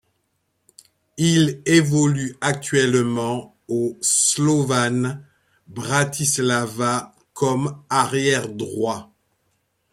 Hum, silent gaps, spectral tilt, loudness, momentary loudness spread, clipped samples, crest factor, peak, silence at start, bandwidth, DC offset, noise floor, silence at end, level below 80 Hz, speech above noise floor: none; none; -4 dB/octave; -20 LUFS; 11 LU; under 0.1%; 18 dB; -2 dBFS; 1.15 s; 16 kHz; under 0.1%; -71 dBFS; 0.9 s; -60 dBFS; 51 dB